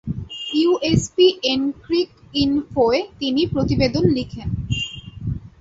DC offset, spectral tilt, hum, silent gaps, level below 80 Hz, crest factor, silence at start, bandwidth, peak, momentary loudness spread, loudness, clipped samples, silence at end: under 0.1%; -5.5 dB/octave; none; none; -38 dBFS; 18 dB; 0.05 s; 8 kHz; -2 dBFS; 12 LU; -20 LUFS; under 0.1%; 0.1 s